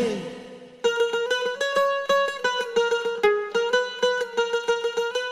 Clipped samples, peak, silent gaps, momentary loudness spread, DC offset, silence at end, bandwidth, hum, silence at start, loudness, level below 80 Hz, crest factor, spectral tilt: under 0.1%; -8 dBFS; none; 5 LU; under 0.1%; 0 s; 13.5 kHz; none; 0 s; -24 LUFS; -66 dBFS; 16 dB; -2 dB/octave